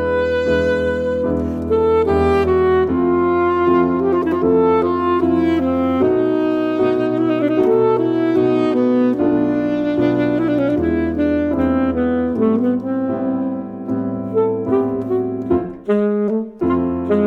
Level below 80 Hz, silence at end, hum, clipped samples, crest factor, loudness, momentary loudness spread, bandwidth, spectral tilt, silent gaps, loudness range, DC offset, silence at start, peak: -40 dBFS; 0 s; none; under 0.1%; 12 dB; -17 LUFS; 5 LU; 7.4 kHz; -8.5 dB/octave; none; 4 LU; under 0.1%; 0 s; -4 dBFS